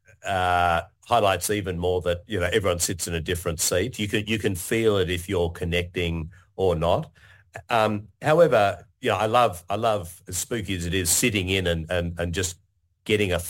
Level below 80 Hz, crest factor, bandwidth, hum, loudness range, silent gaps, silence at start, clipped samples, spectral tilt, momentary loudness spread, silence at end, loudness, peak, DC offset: -46 dBFS; 18 dB; 17 kHz; none; 3 LU; none; 0.25 s; under 0.1%; -4 dB/octave; 8 LU; 0 s; -24 LUFS; -6 dBFS; under 0.1%